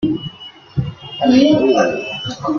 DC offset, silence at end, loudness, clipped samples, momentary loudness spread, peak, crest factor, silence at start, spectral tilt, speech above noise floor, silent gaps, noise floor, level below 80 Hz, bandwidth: under 0.1%; 0 s; -16 LUFS; under 0.1%; 16 LU; 0 dBFS; 16 dB; 0 s; -6 dB/octave; 22 dB; none; -36 dBFS; -46 dBFS; 7 kHz